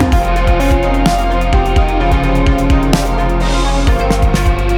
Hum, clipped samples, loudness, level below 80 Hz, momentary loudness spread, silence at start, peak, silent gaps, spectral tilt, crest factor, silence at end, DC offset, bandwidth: none; under 0.1%; -13 LUFS; -14 dBFS; 2 LU; 0 s; 0 dBFS; none; -6 dB/octave; 10 dB; 0 s; under 0.1%; 15.5 kHz